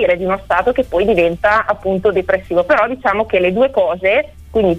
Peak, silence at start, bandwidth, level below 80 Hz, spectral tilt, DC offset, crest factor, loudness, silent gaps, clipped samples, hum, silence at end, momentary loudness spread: -2 dBFS; 0 s; 9.4 kHz; -38 dBFS; -7 dB/octave; under 0.1%; 12 dB; -15 LUFS; none; under 0.1%; none; 0 s; 4 LU